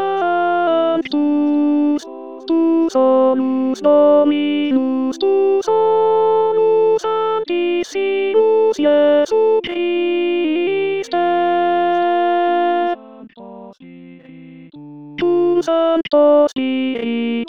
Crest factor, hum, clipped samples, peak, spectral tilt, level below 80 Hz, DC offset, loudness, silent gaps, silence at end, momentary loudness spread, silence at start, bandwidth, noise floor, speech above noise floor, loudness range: 12 dB; none; under 0.1%; -4 dBFS; -5.5 dB/octave; -62 dBFS; 0.5%; -16 LUFS; none; 0 s; 6 LU; 0 s; 8.2 kHz; -39 dBFS; 25 dB; 5 LU